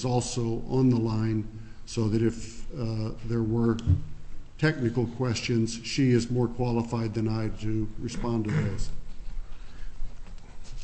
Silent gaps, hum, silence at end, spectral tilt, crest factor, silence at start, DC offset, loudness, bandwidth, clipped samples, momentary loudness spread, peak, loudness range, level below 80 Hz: none; none; 0 s; -6.5 dB/octave; 16 dB; 0 s; under 0.1%; -28 LUFS; 8.6 kHz; under 0.1%; 21 LU; -12 dBFS; 5 LU; -38 dBFS